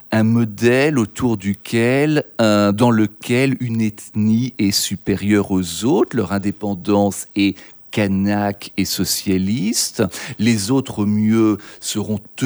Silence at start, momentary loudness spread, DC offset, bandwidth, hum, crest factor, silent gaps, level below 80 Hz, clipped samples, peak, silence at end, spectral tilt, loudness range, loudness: 0.1 s; 7 LU; under 0.1%; over 20 kHz; none; 16 dB; none; -52 dBFS; under 0.1%; -2 dBFS; 0 s; -5 dB/octave; 3 LU; -18 LUFS